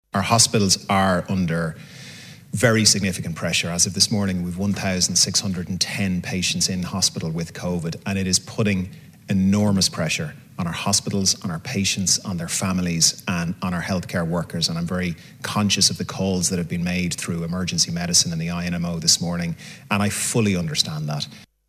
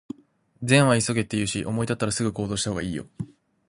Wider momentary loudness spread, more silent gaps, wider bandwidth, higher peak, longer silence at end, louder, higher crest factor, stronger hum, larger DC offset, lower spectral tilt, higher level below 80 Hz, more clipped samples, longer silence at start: second, 10 LU vs 20 LU; neither; first, 16 kHz vs 11.5 kHz; first, 0 dBFS vs -4 dBFS; second, 0.25 s vs 0.45 s; first, -21 LUFS vs -24 LUFS; about the same, 22 dB vs 22 dB; neither; neither; about the same, -3.5 dB/octave vs -4.5 dB/octave; first, -44 dBFS vs -52 dBFS; neither; second, 0.15 s vs 0.6 s